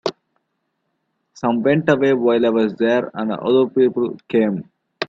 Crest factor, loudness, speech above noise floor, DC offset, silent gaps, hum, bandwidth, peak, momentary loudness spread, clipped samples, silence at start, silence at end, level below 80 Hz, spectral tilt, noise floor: 18 dB; -18 LUFS; 55 dB; under 0.1%; none; none; 7.4 kHz; 0 dBFS; 8 LU; under 0.1%; 0.05 s; 0.05 s; -62 dBFS; -7 dB/octave; -73 dBFS